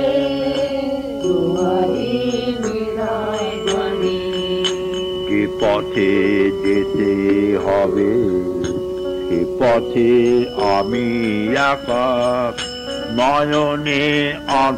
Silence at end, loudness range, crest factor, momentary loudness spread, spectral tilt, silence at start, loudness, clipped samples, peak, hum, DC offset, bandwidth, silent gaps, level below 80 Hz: 0 s; 3 LU; 12 dB; 6 LU; -5.5 dB/octave; 0 s; -18 LUFS; under 0.1%; -6 dBFS; none; under 0.1%; 13 kHz; none; -44 dBFS